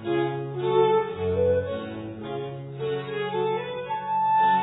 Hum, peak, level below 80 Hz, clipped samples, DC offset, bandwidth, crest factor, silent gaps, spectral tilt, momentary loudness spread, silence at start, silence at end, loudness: none; -8 dBFS; -60 dBFS; under 0.1%; under 0.1%; 4.1 kHz; 16 dB; none; -10 dB/octave; 12 LU; 0 s; 0 s; -26 LUFS